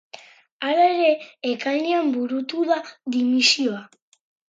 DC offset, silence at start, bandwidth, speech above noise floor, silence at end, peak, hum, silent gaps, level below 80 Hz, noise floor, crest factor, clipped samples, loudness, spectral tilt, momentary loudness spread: under 0.1%; 0.15 s; 9.4 kHz; 25 dB; 0.65 s; -6 dBFS; none; 0.52-0.60 s; -80 dBFS; -46 dBFS; 18 dB; under 0.1%; -21 LUFS; -2.5 dB/octave; 10 LU